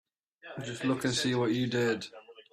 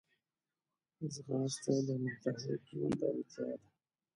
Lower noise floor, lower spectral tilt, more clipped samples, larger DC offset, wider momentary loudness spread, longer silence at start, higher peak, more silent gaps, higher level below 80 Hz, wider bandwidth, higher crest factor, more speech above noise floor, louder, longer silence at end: second, -52 dBFS vs under -90 dBFS; second, -4.5 dB/octave vs -6 dB/octave; neither; neither; first, 14 LU vs 9 LU; second, 0.45 s vs 1 s; first, -16 dBFS vs -20 dBFS; neither; first, -68 dBFS vs -76 dBFS; first, 14 kHz vs 11 kHz; about the same, 16 dB vs 20 dB; second, 21 dB vs over 52 dB; first, -30 LUFS vs -39 LUFS; second, 0.1 s vs 0.55 s